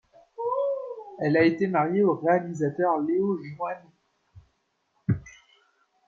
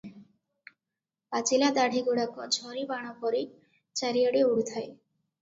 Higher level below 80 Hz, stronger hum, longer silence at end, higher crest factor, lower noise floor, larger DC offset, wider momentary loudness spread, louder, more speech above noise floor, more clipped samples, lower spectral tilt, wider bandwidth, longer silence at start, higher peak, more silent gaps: first, -64 dBFS vs -76 dBFS; neither; first, 0.75 s vs 0.45 s; about the same, 18 dB vs 18 dB; second, -73 dBFS vs -89 dBFS; neither; about the same, 12 LU vs 13 LU; about the same, -26 LUFS vs -28 LUFS; second, 49 dB vs 61 dB; neither; first, -8 dB/octave vs -2.5 dB/octave; about the same, 7.4 kHz vs 8 kHz; first, 0.4 s vs 0.05 s; about the same, -10 dBFS vs -12 dBFS; neither